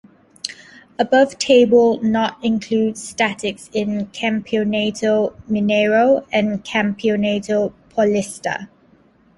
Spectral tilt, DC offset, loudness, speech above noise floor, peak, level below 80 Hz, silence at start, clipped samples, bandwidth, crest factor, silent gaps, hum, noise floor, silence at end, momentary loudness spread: -5 dB/octave; under 0.1%; -18 LUFS; 36 dB; -2 dBFS; -56 dBFS; 0.45 s; under 0.1%; 11.5 kHz; 16 dB; none; none; -53 dBFS; 0.7 s; 11 LU